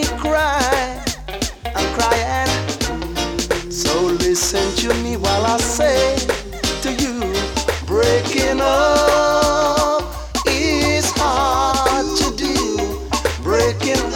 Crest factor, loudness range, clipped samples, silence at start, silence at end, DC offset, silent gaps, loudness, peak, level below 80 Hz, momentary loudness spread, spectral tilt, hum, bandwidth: 18 dB; 3 LU; under 0.1%; 0 s; 0 s; under 0.1%; none; -18 LUFS; 0 dBFS; -30 dBFS; 7 LU; -3.5 dB/octave; none; 19 kHz